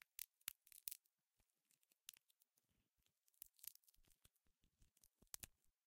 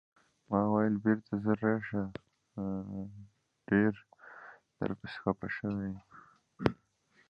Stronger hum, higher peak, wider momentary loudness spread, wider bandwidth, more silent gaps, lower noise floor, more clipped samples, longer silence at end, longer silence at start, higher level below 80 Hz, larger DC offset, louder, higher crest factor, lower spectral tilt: neither; second, -22 dBFS vs -8 dBFS; second, 10 LU vs 21 LU; first, 16.5 kHz vs 6 kHz; neither; first, -89 dBFS vs -70 dBFS; neither; second, 0.2 s vs 0.55 s; second, 0.2 s vs 0.5 s; second, -84 dBFS vs -62 dBFS; neither; second, -57 LUFS vs -34 LUFS; first, 42 dB vs 26 dB; second, 0.5 dB/octave vs -9.5 dB/octave